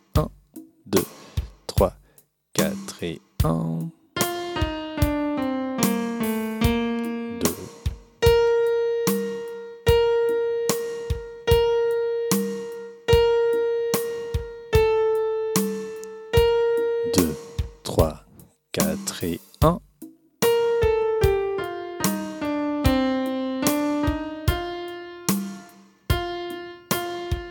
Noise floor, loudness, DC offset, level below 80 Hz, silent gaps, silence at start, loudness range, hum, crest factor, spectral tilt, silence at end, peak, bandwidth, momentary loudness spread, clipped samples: -59 dBFS; -24 LUFS; under 0.1%; -36 dBFS; none; 0.15 s; 4 LU; none; 20 dB; -5 dB/octave; 0 s; -4 dBFS; 19 kHz; 12 LU; under 0.1%